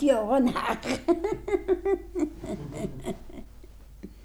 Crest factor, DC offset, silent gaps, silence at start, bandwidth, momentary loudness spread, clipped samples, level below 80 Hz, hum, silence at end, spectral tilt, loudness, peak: 18 dB; under 0.1%; none; 0 s; over 20 kHz; 20 LU; under 0.1%; -46 dBFS; none; 0 s; -6 dB/octave; -28 LUFS; -12 dBFS